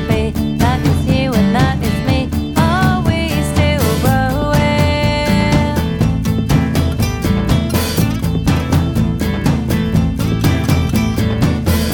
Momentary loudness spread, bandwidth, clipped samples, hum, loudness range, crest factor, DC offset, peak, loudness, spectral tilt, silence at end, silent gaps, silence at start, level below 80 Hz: 3 LU; 20 kHz; under 0.1%; none; 1 LU; 12 dB; under 0.1%; -2 dBFS; -15 LUFS; -6 dB/octave; 0 s; none; 0 s; -24 dBFS